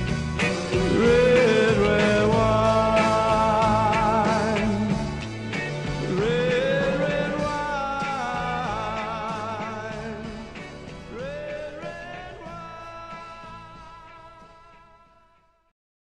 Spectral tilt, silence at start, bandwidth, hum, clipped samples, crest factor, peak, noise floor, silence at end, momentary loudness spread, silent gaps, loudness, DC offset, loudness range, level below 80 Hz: -6 dB/octave; 0 s; 11 kHz; none; under 0.1%; 18 dB; -6 dBFS; -61 dBFS; 1.7 s; 19 LU; none; -23 LUFS; 0.1%; 20 LU; -42 dBFS